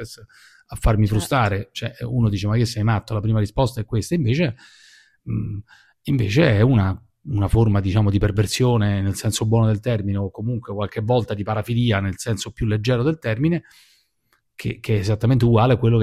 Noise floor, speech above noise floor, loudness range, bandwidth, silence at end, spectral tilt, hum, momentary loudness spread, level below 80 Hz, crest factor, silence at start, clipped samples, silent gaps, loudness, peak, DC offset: -67 dBFS; 47 dB; 4 LU; 14.5 kHz; 0 s; -6.5 dB/octave; none; 11 LU; -36 dBFS; 18 dB; 0 s; under 0.1%; none; -21 LUFS; -2 dBFS; under 0.1%